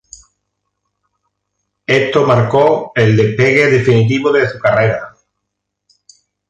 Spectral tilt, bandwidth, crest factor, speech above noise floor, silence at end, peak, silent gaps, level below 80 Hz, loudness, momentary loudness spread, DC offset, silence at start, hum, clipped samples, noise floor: -6.5 dB/octave; 8 kHz; 14 dB; 64 dB; 1.4 s; 0 dBFS; none; -48 dBFS; -12 LUFS; 5 LU; under 0.1%; 1.9 s; 50 Hz at -45 dBFS; under 0.1%; -75 dBFS